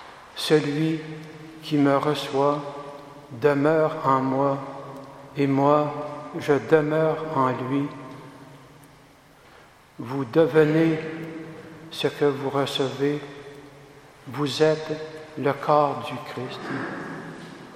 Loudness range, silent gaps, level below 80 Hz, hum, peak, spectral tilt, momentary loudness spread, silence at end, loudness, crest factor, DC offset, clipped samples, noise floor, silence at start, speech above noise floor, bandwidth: 4 LU; none; -64 dBFS; none; -4 dBFS; -6.5 dB/octave; 20 LU; 0 s; -24 LUFS; 22 dB; under 0.1%; under 0.1%; -52 dBFS; 0 s; 29 dB; 15 kHz